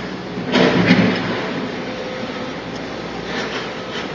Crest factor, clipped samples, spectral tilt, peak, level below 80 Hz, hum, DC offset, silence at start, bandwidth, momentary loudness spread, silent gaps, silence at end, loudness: 20 dB; under 0.1%; -6 dB/octave; 0 dBFS; -48 dBFS; none; under 0.1%; 0 s; 7.6 kHz; 13 LU; none; 0 s; -20 LUFS